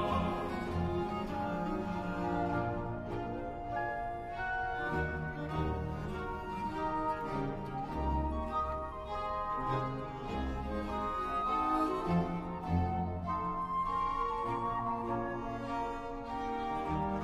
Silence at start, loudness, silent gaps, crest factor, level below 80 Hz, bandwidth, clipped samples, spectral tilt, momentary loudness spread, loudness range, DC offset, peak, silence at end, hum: 0 s; -36 LUFS; none; 16 dB; -46 dBFS; 13.5 kHz; under 0.1%; -7.5 dB/octave; 6 LU; 3 LU; under 0.1%; -20 dBFS; 0 s; none